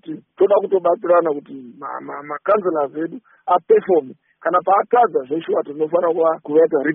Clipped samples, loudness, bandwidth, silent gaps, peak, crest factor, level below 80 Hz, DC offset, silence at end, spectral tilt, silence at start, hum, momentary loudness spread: under 0.1%; -18 LUFS; 3.7 kHz; none; -4 dBFS; 14 dB; -70 dBFS; under 0.1%; 0 s; -1 dB/octave; 0.05 s; none; 14 LU